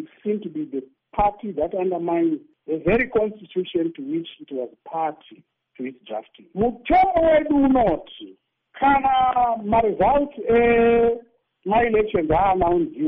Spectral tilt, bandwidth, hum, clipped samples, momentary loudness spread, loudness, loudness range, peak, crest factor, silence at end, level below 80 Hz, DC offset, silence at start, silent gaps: -5 dB/octave; 4.7 kHz; none; under 0.1%; 15 LU; -21 LUFS; 7 LU; -8 dBFS; 14 dB; 0 s; -42 dBFS; under 0.1%; 0 s; none